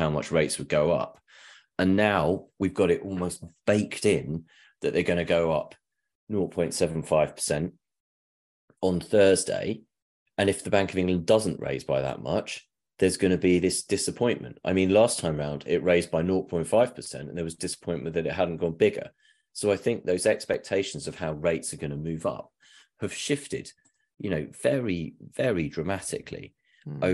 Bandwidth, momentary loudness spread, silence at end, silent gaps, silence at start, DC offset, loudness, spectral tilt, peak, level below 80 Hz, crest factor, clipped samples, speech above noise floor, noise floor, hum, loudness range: 12.5 kHz; 13 LU; 0 s; 6.15-6.27 s, 8.00-8.68 s, 10.02-10.26 s; 0 s; under 0.1%; -27 LUFS; -5 dB/octave; -6 dBFS; -54 dBFS; 20 dB; under 0.1%; 27 dB; -53 dBFS; none; 6 LU